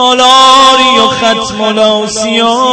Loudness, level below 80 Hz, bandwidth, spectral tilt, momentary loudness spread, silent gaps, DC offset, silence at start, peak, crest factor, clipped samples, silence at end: -6 LUFS; -42 dBFS; 11 kHz; -2 dB/octave; 9 LU; none; under 0.1%; 0 s; 0 dBFS; 6 dB; 3%; 0 s